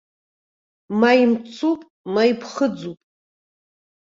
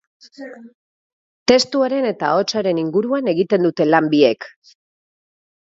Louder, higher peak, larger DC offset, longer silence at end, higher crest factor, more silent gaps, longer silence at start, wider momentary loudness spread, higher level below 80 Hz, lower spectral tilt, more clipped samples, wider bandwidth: second, -20 LUFS vs -17 LUFS; about the same, -2 dBFS vs 0 dBFS; neither; about the same, 1.25 s vs 1.3 s; about the same, 20 dB vs 18 dB; second, 1.90-2.04 s vs 0.75-1.46 s; first, 0.9 s vs 0.4 s; second, 13 LU vs 21 LU; second, -68 dBFS vs -62 dBFS; about the same, -5.5 dB/octave vs -5 dB/octave; neither; about the same, 7.6 kHz vs 7.8 kHz